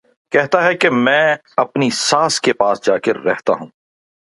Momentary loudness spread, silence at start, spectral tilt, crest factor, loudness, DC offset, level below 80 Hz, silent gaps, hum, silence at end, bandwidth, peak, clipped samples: 6 LU; 0.3 s; -3.5 dB/octave; 16 dB; -15 LUFS; under 0.1%; -64 dBFS; none; none; 0.55 s; 11.5 kHz; 0 dBFS; under 0.1%